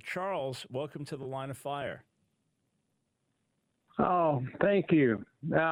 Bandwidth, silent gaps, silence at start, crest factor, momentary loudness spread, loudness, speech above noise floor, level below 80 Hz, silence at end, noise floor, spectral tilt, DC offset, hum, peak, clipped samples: 16 kHz; none; 0.05 s; 20 dB; 14 LU; -31 LUFS; 48 dB; -66 dBFS; 0 s; -79 dBFS; -7 dB/octave; under 0.1%; none; -14 dBFS; under 0.1%